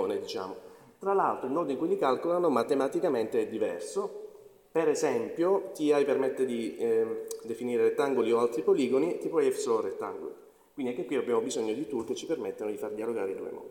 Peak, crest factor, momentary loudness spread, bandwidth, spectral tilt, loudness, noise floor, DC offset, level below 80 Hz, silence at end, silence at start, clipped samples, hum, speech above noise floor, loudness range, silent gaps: -12 dBFS; 18 dB; 11 LU; 17 kHz; -5 dB/octave; -30 LUFS; -50 dBFS; under 0.1%; -74 dBFS; 0 s; 0 s; under 0.1%; none; 21 dB; 4 LU; none